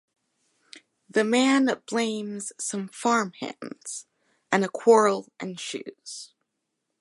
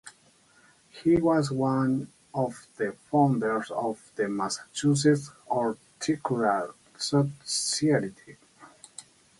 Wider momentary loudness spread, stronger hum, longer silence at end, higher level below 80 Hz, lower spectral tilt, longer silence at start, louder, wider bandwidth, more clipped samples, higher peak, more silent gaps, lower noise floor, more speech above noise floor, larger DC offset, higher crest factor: first, 18 LU vs 10 LU; neither; first, 0.75 s vs 0.4 s; second, -80 dBFS vs -64 dBFS; about the same, -4 dB/octave vs -5 dB/octave; first, 0.75 s vs 0.05 s; about the same, -25 LUFS vs -27 LUFS; about the same, 11.5 kHz vs 11.5 kHz; neither; first, -6 dBFS vs -10 dBFS; neither; first, -80 dBFS vs -61 dBFS; first, 55 dB vs 34 dB; neither; about the same, 22 dB vs 18 dB